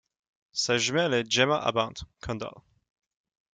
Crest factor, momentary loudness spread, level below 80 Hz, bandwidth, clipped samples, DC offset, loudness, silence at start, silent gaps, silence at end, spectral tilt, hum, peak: 20 dB; 13 LU; -58 dBFS; 9.6 kHz; under 0.1%; under 0.1%; -27 LUFS; 0.55 s; none; 0.95 s; -3 dB/octave; none; -10 dBFS